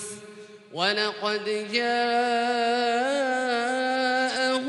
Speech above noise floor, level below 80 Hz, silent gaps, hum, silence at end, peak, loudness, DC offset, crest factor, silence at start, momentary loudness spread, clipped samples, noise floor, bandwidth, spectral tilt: 20 dB; under -90 dBFS; none; none; 0 s; -8 dBFS; -25 LUFS; under 0.1%; 18 dB; 0 s; 5 LU; under 0.1%; -45 dBFS; 11.5 kHz; -2.5 dB/octave